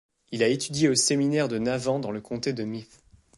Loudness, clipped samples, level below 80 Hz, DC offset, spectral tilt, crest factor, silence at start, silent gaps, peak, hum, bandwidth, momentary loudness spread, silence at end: -25 LUFS; under 0.1%; -62 dBFS; under 0.1%; -4 dB/octave; 18 dB; 0.3 s; none; -10 dBFS; none; 11.5 kHz; 12 LU; 0.55 s